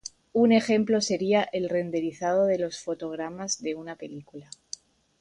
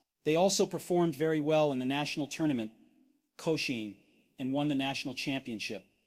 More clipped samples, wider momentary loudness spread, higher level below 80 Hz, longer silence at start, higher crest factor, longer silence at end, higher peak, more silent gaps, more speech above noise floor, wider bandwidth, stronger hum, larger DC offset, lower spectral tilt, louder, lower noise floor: neither; first, 19 LU vs 11 LU; about the same, -68 dBFS vs -72 dBFS; second, 0.05 s vs 0.25 s; about the same, 18 dB vs 16 dB; first, 0.8 s vs 0.25 s; first, -8 dBFS vs -16 dBFS; neither; second, 20 dB vs 38 dB; second, 11 kHz vs 16 kHz; neither; neither; about the same, -4.5 dB/octave vs -4.5 dB/octave; first, -26 LUFS vs -32 LUFS; second, -46 dBFS vs -69 dBFS